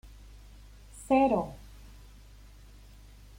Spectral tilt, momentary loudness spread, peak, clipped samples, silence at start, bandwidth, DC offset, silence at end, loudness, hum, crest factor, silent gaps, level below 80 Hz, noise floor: -6.5 dB/octave; 28 LU; -14 dBFS; under 0.1%; 0.05 s; 16.5 kHz; under 0.1%; 1.8 s; -27 LUFS; none; 20 dB; none; -52 dBFS; -52 dBFS